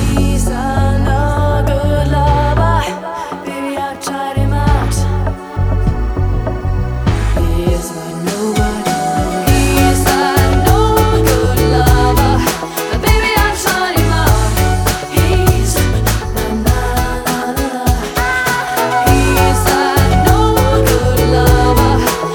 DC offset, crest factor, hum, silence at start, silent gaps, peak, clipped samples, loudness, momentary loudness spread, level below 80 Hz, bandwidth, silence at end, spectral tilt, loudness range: under 0.1%; 12 dB; none; 0 s; none; 0 dBFS; under 0.1%; -13 LUFS; 8 LU; -18 dBFS; over 20 kHz; 0 s; -5 dB/octave; 5 LU